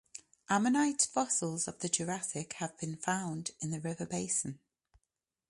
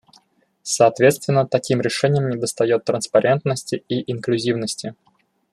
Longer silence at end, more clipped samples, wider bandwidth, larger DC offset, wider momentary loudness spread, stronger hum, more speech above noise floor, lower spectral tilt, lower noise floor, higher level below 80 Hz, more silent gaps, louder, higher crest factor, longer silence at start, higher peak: first, 0.95 s vs 0.6 s; neither; second, 11.5 kHz vs 13 kHz; neither; about the same, 10 LU vs 9 LU; neither; first, 54 dB vs 39 dB; second, -3.5 dB/octave vs -5 dB/octave; first, -88 dBFS vs -58 dBFS; second, -72 dBFS vs -62 dBFS; neither; second, -34 LUFS vs -20 LUFS; about the same, 22 dB vs 18 dB; second, 0.15 s vs 0.65 s; second, -12 dBFS vs -2 dBFS